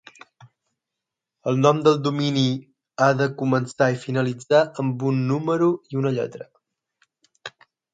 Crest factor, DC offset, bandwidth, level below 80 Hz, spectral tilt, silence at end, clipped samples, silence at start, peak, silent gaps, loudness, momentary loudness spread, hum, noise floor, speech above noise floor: 20 dB; under 0.1%; 9.2 kHz; -68 dBFS; -6.5 dB/octave; 0.45 s; under 0.1%; 1.45 s; -2 dBFS; none; -22 LUFS; 16 LU; none; -85 dBFS; 64 dB